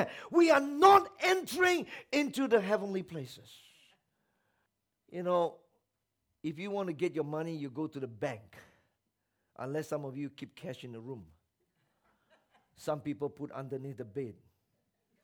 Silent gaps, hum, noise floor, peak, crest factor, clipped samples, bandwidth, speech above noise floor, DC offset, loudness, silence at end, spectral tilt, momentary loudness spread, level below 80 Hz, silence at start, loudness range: none; none; -84 dBFS; -8 dBFS; 26 dB; under 0.1%; 19 kHz; 52 dB; under 0.1%; -31 LUFS; 0.9 s; -5 dB/octave; 20 LU; -74 dBFS; 0 s; 14 LU